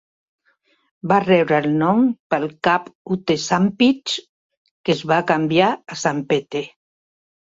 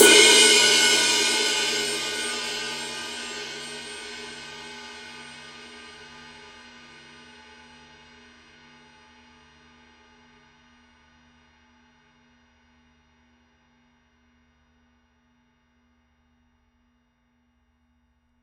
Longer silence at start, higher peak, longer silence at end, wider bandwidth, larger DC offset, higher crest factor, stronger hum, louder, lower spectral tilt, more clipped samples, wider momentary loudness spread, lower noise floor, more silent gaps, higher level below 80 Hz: first, 1.05 s vs 0 s; about the same, -2 dBFS vs -2 dBFS; second, 0.8 s vs 12.15 s; second, 7.8 kHz vs 16 kHz; neither; second, 18 dB vs 26 dB; second, none vs 60 Hz at -80 dBFS; about the same, -19 LUFS vs -19 LUFS; first, -5.5 dB/octave vs 0.5 dB/octave; neither; second, 11 LU vs 30 LU; second, -63 dBFS vs -68 dBFS; first, 2.20-2.30 s, 2.95-3.05 s, 4.29-4.50 s, 4.57-4.65 s, 4.71-4.84 s vs none; first, -60 dBFS vs -66 dBFS